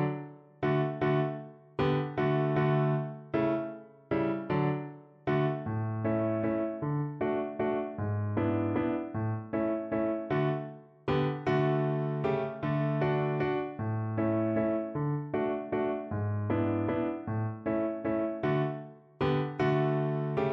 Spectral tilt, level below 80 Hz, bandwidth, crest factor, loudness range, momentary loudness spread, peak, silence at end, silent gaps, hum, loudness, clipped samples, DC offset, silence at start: -10 dB/octave; -60 dBFS; 5.8 kHz; 14 dB; 2 LU; 6 LU; -16 dBFS; 0 s; none; none; -31 LUFS; under 0.1%; under 0.1%; 0 s